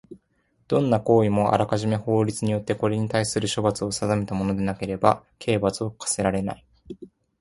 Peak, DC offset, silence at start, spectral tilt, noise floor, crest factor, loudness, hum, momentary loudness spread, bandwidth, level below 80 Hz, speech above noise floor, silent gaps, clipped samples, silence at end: -2 dBFS; under 0.1%; 0.1 s; -5.5 dB/octave; -67 dBFS; 22 dB; -24 LUFS; none; 9 LU; 11.5 kHz; -50 dBFS; 44 dB; none; under 0.1%; 0.35 s